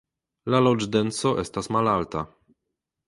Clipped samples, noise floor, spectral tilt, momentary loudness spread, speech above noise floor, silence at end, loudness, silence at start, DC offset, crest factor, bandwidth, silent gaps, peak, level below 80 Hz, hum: under 0.1%; -83 dBFS; -5.5 dB/octave; 12 LU; 59 dB; 0.8 s; -24 LUFS; 0.45 s; under 0.1%; 20 dB; 11.5 kHz; none; -6 dBFS; -54 dBFS; none